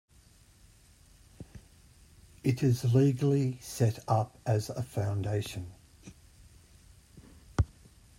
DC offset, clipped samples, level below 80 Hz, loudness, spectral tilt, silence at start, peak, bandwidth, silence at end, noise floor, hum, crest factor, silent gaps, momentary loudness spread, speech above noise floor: under 0.1%; under 0.1%; -52 dBFS; -30 LUFS; -7 dB/octave; 1.4 s; -12 dBFS; 16 kHz; 0.55 s; -60 dBFS; none; 20 dB; none; 20 LU; 31 dB